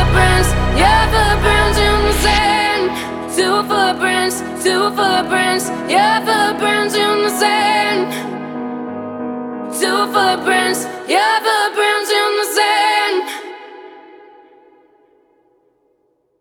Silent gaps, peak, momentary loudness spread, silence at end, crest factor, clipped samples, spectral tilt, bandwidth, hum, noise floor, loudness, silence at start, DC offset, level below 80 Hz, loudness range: none; 0 dBFS; 12 LU; 2.4 s; 16 dB; under 0.1%; -3.5 dB/octave; 19.5 kHz; none; -62 dBFS; -15 LUFS; 0 s; under 0.1%; -26 dBFS; 4 LU